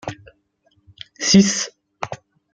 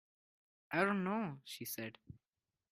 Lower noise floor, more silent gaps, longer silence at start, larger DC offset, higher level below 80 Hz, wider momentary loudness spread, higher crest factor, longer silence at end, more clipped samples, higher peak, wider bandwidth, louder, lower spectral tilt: second, -63 dBFS vs under -90 dBFS; neither; second, 0.05 s vs 0.7 s; neither; first, -54 dBFS vs -78 dBFS; first, 25 LU vs 13 LU; about the same, 20 dB vs 24 dB; second, 0.4 s vs 0.6 s; neither; first, -2 dBFS vs -18 dBFS; second, 9.2 kHz vs 15.5 kHz; first, -17 LUFS vs -39 LUFS; about the same, -4 dB/octave vs -5 dB/octave